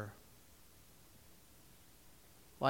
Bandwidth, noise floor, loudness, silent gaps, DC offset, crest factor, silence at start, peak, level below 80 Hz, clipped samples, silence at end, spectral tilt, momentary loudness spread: 17 kHz; -63 dBFS; -60 LUFS; none; under 0.1%; 28 dB; 0 s; -18 dBFS; -70 dBFS; under 0.1%; 0 s; -5.5 dB/octave; 1 LU